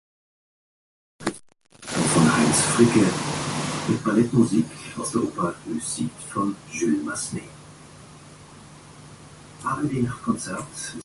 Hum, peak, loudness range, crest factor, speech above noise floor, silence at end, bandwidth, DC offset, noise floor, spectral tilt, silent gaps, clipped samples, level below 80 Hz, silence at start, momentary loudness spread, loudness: none; -4 dBFS; 11 LU; 22 dB; 23 dB; 0 s; 11.5 kHz; under 0.1%; -45 dBFS; -4.5 dB/octave; none; under 0.1%; -54 dBFS; 1.2 s; 14 LU; -23 LUFS